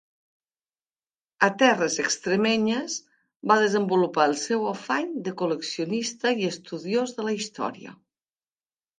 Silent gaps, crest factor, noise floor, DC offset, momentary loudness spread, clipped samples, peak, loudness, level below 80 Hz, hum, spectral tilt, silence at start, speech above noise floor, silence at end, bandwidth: 3.36-3.40 s; 22 dB; under -90 dBFS; under 0.1%; 11 LU; under 0.1%; -4 dBFS; -25 LUFS; -74 dBFS; none; -3.5 dB/octave; 1.4 s; over 65 dB; 1.1 s; 9.8 kHz